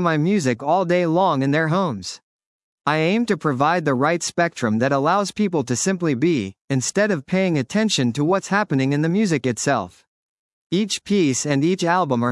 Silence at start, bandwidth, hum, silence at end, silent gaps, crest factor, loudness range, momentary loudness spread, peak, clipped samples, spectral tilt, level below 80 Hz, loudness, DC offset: 0 s; 12 kHz; none; 0 s; 2.23-2.39 s, 2.46-2.78 s, 6.61-6.68 s, 10.07-10.70 s; 16 dB; 1 LU; 5 LU; -4 dBFS; under 0.1%; -5 dB/octave; -66 dBFS; -20 LUFS; under 0.1%